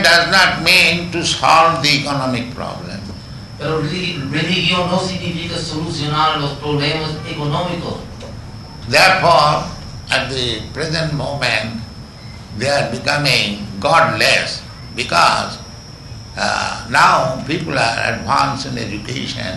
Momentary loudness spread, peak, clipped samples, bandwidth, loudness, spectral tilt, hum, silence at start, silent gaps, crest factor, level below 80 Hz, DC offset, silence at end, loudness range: 20 LU; 0 dBFS; under 0.1%; 12 kHz; -15 LUFS; -3.5 dB/octave; none; 0 s; none; 16 dB; -40 dBFS; under 0.1%; 0 s; 5 LU